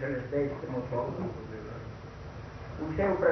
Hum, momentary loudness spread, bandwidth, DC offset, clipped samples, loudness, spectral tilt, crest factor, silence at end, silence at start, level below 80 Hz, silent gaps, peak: none; 14 LU; 6.4 kHz; under 0.1%; under 0.1%; -35 LUFS; -8.5 dB/octave; 20 dB; 0 s; 0 s; -50 dBFS; none; -12 dBFS